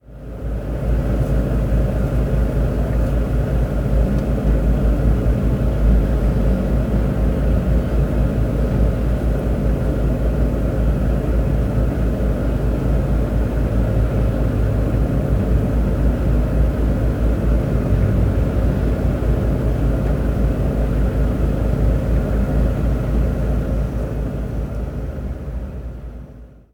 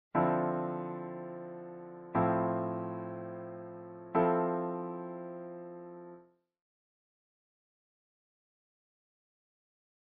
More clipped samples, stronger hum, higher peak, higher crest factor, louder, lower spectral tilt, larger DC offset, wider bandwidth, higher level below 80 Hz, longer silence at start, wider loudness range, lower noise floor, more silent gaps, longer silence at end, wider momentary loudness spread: neither; neither; first, -4 dBFS vs -16 dBFS; second, 14 dB vs 22 dB; first, -20 LUFS vs -35 LUFS; about the same, -9 dB/octave vs -8.5 dB/octave; neither; first, 5.4 kHz vs 3.7 kHz; first, -20 dBFS vs -72 dBFS; about the same, 0.1 s vs 0.15 s; second, 2 LU vs 16 LU; second, -39 dBFS vs -58 dBFS; neither; second, 0.25 s vs 3.95 s; second, 6 LU vs 17 LU